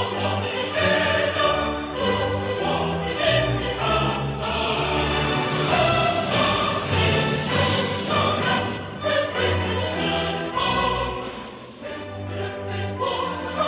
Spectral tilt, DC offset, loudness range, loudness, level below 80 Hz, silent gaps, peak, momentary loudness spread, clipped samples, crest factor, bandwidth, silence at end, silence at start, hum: -9.5 dB/octave; under 0.1%; 5 LU; -22 LUFS; -40 dBFS; none; -6 dBFS; 9 LU; under 0.1%; 16 dB; 4 kHz; 0 s; 0 s; none